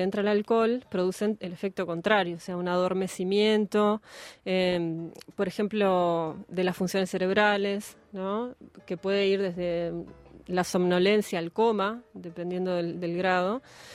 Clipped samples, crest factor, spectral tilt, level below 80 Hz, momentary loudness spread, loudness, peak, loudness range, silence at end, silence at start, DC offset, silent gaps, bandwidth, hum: under 0.1%; 20 dB; -5.5 dB/octave; -64 dBFS; 12 LU; -27 LUFS; -8 dBFS; 2 LU; 0 s; 0 s; under 0.1%; none; 15.5 kHz; none